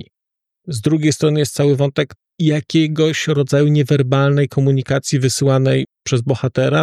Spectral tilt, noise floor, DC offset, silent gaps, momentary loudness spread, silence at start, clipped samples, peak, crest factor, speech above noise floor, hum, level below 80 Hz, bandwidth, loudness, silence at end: -6 dB/octave; -82 dBFS; under 0.1%; none; 6 LU; 0.65 s; under 0.1%; -4 dBFS; 12 dB; 67 dB; none; -56 dBFS; 13 kHz; -16 LUFS; 0 s